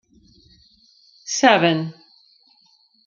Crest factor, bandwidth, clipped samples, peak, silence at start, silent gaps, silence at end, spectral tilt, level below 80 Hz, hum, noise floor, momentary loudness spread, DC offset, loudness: 22 dB; 7.4 kHz; under 0.1%; -2 dBFS; 1.25 s; none; 1.15 s; -3.5 dB/octave; -66 dBFS; none; -59 dBFS; 19 LU; under 0.1%; -17 LUFS